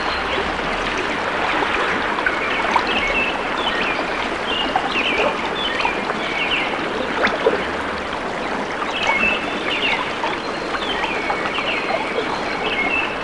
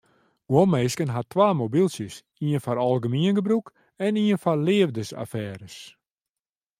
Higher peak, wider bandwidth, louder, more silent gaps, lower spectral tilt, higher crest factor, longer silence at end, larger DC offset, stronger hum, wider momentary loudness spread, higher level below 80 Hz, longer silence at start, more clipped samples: about the same, -4 dBFS vs -6 dBFS; second, 11.5 kHz vs 15.5 kHz; first, -20 LUFS vs -24 LUFS; neither; second, -3.5 dB/octave vs -6.5 dB/octave; about the same, 18 dB vs 18 dB; second, 0 s vs 0.9 s; first, 0.3% vs under 0.1%; neither; second, 5 LU vs 13 LU; first, -42 dBFS vs -66 dBFS; second, 0 s vs 0.5 s; neither